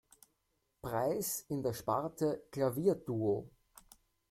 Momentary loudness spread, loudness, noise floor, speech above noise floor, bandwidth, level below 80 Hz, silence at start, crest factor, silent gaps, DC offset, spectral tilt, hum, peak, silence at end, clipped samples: 7 LU; -36 LUFS; -81 dBFS; 46 dB; 16.5 kHz; -68 dBFS; 0.85 s; 18 dB; none; under 0.1%; -6 dB/octave; none; -18 dBFS; 0.85 s; under 0.1%